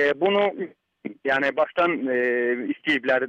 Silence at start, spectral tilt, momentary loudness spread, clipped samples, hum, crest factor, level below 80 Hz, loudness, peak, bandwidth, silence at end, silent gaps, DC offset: 0 s; -6 dB/octave; 14 LU; under 0.1%; none; 14 dB; -68 dBFS; -23 LUFS; -10 dBFS; 8.4 kHz; 0 s; none; under 0.1%